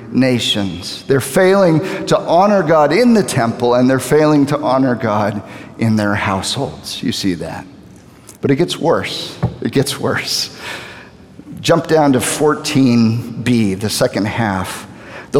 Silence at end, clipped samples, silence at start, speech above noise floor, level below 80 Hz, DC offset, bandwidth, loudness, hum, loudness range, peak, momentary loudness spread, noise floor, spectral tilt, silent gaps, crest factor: 0 s; under 0.1%; 0 s; 26 dB; -50 dBFS; under 0.1%; 17.5 kHz; -15 LUFS; none; 6 LU; 0 dBFS; 12 LU; -40 dBFS; -5 dB/octave; none; 14 dB